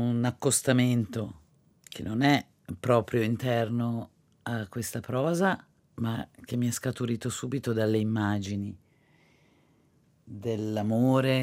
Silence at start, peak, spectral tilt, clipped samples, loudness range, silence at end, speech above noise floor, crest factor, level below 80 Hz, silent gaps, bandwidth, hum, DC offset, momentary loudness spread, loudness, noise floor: 0 s; -8 dBFS; -5.5 dB/octave; under 0.1%; 5 LU; 0 s; 37 dB; 20 dB; -66 dBFS; none; 17 kHz; none; under 0.1%; 13 LU; -29 LUFS; -65 dBFS